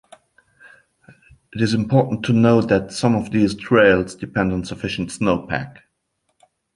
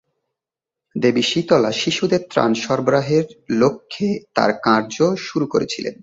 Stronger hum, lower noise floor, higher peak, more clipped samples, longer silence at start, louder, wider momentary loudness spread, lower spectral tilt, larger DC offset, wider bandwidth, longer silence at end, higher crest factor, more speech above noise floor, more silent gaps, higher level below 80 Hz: neither; second, -71 dBFS vs -87 dBFS; about the same, -2 dBFS vs -2 dBFS; neither; first, 1.55 s vs 0.95 s; about the same, -19 LUFS vs -19 LUFS; first, 11 LU vs 7 LU; first, -6.5 dB/octave vs -5 dB/octave; neither; first, 11.5 kHz vs 8 kHz; first, 1.05 s vs 0.1 s; about the same, 18 dB vs 18 dB; second, 53 dB vs 68 dB; neither; first, -46 dBFS vs -58 dBFS